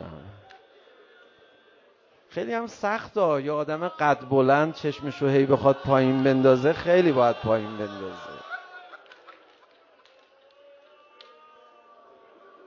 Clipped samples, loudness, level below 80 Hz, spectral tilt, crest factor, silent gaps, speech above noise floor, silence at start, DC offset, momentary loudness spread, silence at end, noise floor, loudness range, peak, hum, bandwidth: under 0.1%; -23 LUFS; -60 dBFS; -7.5 dB/octave; 20 dB; none; 37 dB; 0 s; under 0.1%; 18 LU; 3.35 s; -59 dBFS; 13 LU; -6 dBFS; none; 7.2 kHz